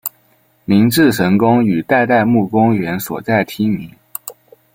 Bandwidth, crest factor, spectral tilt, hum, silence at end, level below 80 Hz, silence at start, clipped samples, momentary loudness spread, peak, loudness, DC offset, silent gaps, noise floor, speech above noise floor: 17 kHz; 14 dB; -6 dB/octave; none; 0.45 s; -52 dBFS; 0.05 s; under 0.1%; 16 LU; -2 dBFS; -14 LUFS; under 0.1%; none; -55 dBFS; 42 dB